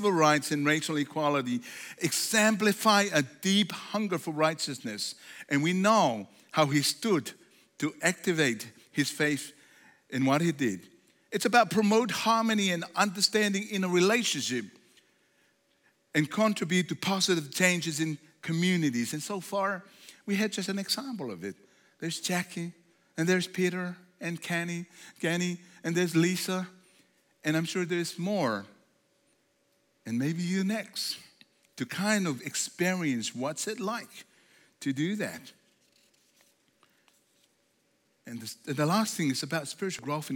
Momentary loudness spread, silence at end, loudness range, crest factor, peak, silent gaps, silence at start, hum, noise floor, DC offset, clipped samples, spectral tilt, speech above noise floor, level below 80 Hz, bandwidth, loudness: 13 LU; 0 s; 8 LU; 22 dB; -8 dBFS; none; 0 s; none; -71 dBFS; under 0.1%; under 0.1%; -4 dB/octave; 43 dB; -88 dBFS; 18 kHz; -29 LUFS